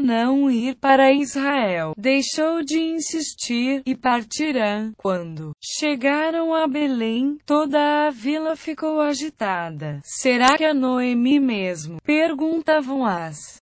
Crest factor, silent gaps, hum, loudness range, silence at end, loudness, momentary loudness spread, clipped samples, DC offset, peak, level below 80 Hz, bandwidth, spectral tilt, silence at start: 18 dB; none; none; 3 LU; 0.05 s; -21 LUFS; 9 LU; under 0.1%; under 0.1%; -2 dBFS; -62 dBFS; 8 kHz; -4 dB/octave; 0 s